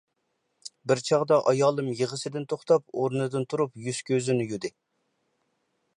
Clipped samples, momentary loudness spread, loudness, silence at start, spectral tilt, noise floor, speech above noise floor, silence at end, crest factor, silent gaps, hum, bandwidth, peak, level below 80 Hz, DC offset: under 0.1%; 12 LU; -26 LUFS; 0.65 s; -5.5 dB/octave; -77 dBFS; 51 dB; 1.3 s; 18 dB; none; none; 11.5 kHz; -10 dBFS; -74 dBFS; under 0.1%